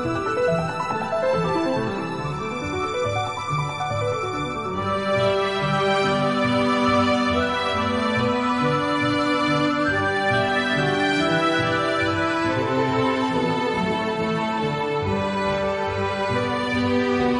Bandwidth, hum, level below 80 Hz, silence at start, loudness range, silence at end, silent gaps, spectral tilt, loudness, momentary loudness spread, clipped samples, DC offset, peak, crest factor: 11.5 kHz; none; -50 dBFS; 0 s; 4 LU; 0 s; none; -5.5 dB/octave; -22 LUFS; 5 LU; under 0.1%; under 0.1%; -8 dBFS; 14 dB